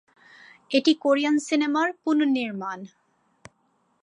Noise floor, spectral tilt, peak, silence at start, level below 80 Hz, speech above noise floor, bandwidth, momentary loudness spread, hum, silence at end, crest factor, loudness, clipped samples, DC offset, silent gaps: -68 dBFS; -4 dB/octave; -8 dBFS; 0.7 s; -76 dBFS; 45 dB; 10.5 kHz; 11 LU; none; 1.15 s; 18 dB; -23 LUFS; under 0.1%; under 0.1%; none